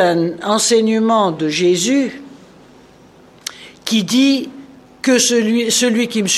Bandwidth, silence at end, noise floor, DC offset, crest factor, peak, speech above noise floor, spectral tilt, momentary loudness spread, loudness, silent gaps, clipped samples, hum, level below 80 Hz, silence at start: 14 kHz; 0 s; -45 dBFS; under 0.1%; 14 dB; -2 dBFS; 30 dB; -3 dB/octave; 17 LU; -15 LUFS; none; under 0.1%; none; -62 dBFS; 0 s